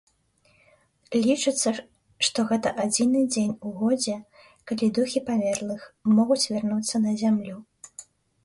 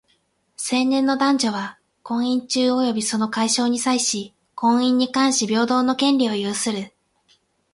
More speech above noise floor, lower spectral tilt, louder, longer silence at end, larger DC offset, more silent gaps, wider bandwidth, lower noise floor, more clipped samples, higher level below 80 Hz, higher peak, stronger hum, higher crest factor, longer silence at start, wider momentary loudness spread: second, 40 dB vs 46 dB; about the same, -4 dB/octave vs -3 dB/octave; second, -25 LUFS vs -20 LUFS; second, 0.4 s vs 0.85 s; neither; neither; about the same, 11.5 kHz vs 11.5 kHz; about the same, -64 dBFS vs -66 dBFS; neither; about the same, -66 dBFS vs -66 dBFS; about the same, -8 dBFS vs -6 dBFS; neither; about the same, 18 dB vs 16 dB; first, 1.1 s vs 0.6 s; first, 13 LU vs 10 LU